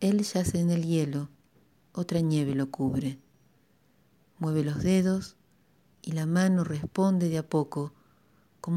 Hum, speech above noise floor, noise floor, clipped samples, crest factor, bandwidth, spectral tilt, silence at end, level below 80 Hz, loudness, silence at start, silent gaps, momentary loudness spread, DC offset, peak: none; 39 dB; -66 dBFS; under 0.1%; 16 dB; 14 kHz; -7 dB/octave; 0 s; -56 dBFS; -28 LUFS; 0 s; none; 13 LU; under 0.1%; -12 dBFS